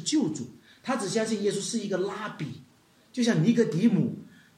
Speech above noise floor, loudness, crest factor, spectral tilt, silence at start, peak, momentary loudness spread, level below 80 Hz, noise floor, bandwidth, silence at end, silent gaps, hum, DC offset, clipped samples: 30 dB; -27 LUFS; 16 dB; -5.5 dB/octave; 0 s; -10 dBFS; 16 LU; -74 dBFS; -57 dBFS; 12 kHz; 0.3 s; none; none; under 0.1%; under 0.1%